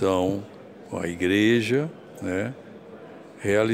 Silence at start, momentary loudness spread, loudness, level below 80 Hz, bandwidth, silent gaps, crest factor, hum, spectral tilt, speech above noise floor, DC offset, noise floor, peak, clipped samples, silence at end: 0 s; 23 LU; -25 LUFS; -60 dBFS; 15.5 kHz; none; 18 dB; none; -6 dB/octave; 20 dB; under 0.1%; -43 dBFS; -8 dBFS; under 0.1%; 0 s